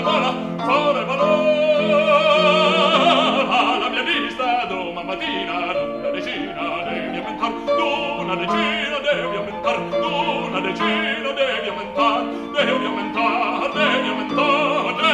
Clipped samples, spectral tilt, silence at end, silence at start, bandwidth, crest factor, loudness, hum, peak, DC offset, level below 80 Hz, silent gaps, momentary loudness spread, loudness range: under 0.1%; -4.5 dB/octave; 0 s; 0 s; 10 kHz; 16 dB; -19 LUFS; none; -4 dBFS; under 0.1%; -54 dBFS; none; 10 LU; 7 LU